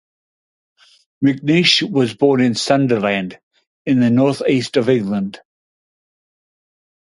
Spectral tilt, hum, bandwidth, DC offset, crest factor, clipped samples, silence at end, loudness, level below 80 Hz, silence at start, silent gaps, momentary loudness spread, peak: -5.5 dB/octave; none; 11.5 kHz; under 0.1%; 18 dB; under 0.1%; 1.75 s; -16 LUFS; -60 dBFS; 1.2 s; 3.43-3.51 s, 3.67-3.85 s; 9 LU; 0 dBFS